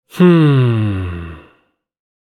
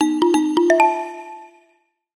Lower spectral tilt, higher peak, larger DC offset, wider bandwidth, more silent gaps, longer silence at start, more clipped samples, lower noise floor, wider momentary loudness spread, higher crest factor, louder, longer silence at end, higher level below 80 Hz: first, -9 dB/octave vs -3 dB/octave; about the same, 0 dBFS vs -2 dBFS; neither; about the same, 12 kHz vs 12.5 kHz; neither; first, 0.15 s vs 0 s; neither; second, -58 dBFS vs -63 dBFS; about the same, 19 LU vs 20 LU; about the same, 14 dB vs 16 dB; first, -13 LUFS vs -17 LUFS; first, 0.95 s vs 0.7 s; first, -42 dBFS vs -68 dBFS